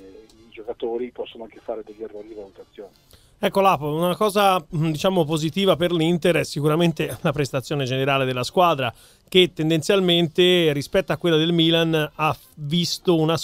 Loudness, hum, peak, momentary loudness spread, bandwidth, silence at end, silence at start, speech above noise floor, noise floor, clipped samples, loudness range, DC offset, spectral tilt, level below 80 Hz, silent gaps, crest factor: -20 LUFS; none; -4 dBFS; 16 LU; 16 kHz; 0 s; 0 s; 25 dB; -46 dBFS; under 0.1%; 7 LU; under 0.1%; -5.5 dB/octave; -54 dBFS; none; 18 dB